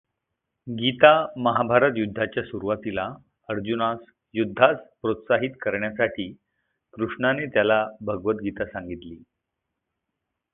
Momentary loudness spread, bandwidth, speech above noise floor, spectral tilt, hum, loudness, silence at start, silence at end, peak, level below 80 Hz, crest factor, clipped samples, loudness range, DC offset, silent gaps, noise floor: 15 LU; 4 kHz; 59 dB; -10 dB/octave; none; -23 LUFS; 0.65 s; 1.35 s; 0 dBFS; -58 dBFS; 24 dB; under 0.1%; 4 LU; under 0.1%; none; -82 dBFS